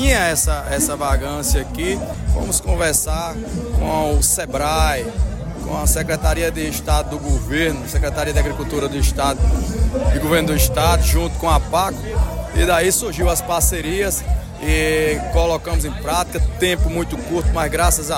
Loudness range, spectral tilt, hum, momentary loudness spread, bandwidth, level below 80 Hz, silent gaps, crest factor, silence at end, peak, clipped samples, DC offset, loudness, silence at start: 2 LU; -4 dB/octave; none; 7 LU; 16.5 kHz; -22 dBFS; none; 16 dB; 0 s; -2 dBFS; under 0.1%; under 0.1%; -19 LUFS; 0 s